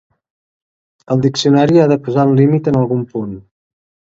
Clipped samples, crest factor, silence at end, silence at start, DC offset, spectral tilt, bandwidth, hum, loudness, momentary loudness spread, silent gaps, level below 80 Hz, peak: under 0.1%; 14 dB; 0.75 s; 1.1 s; under 0.1%; -7 dB/octave; 7.8 kHz; none; -13 LUFS; 13 LU; none; -50 dBFS; 0 dBFS